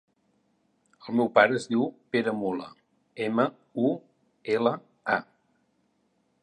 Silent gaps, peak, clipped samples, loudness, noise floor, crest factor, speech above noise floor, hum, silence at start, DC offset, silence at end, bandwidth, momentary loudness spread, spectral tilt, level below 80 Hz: none; -4 dBFS; under 0.1%; -27 LUFS; -71 dBFS; 24 dB; 45 dB; none; 1.05 s; under 0.1%; 1.2 s; 11 kHz; 15 LU; -6 dB/octave; -76 dBFS